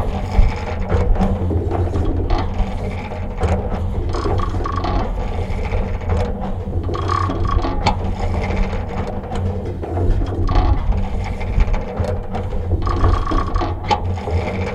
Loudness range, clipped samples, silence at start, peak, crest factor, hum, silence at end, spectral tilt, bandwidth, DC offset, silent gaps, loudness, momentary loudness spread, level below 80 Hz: 1 LU; under 0.1%; 0 s; -2 dBFS; 16 dB; none; 0 s; -7.5 dB/octave; 8.4 kHz; under 0.1%; none; -21 LUFS; 6 LU; -20 dBFS